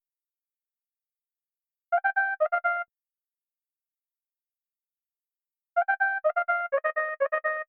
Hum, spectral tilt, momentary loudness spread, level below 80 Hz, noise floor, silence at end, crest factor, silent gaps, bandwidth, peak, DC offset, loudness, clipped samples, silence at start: none; -3 dB/octave; 5 LU; under -90 dBFS; under -90 dBFS; 0.05 s; 18 dB; none; 4.4 kHz; -12 dBFS; under 0.1%; -27 LUFS; under 0.1%; 1.9 s